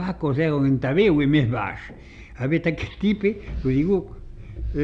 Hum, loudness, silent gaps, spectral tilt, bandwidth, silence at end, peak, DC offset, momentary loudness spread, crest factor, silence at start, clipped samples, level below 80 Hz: none; -22 LUFS; none; -9 dB/octave; 7.2 kHz; 0 s; -8 dBFS; under 0.1%; 20 LU; 14 dB; 0 s; under 0.1%; -38 dBFS